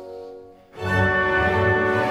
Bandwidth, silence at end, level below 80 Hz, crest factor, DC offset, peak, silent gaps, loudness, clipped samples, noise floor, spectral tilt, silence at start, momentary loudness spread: 12.5 kHz; 0 s; -42 dBFS; 14 dB; under 0.1%; -6 dBFS; none; -20 LUFS; under 0.1%; -42 dBFS; -7 dB/octave; 0 s; 19 LU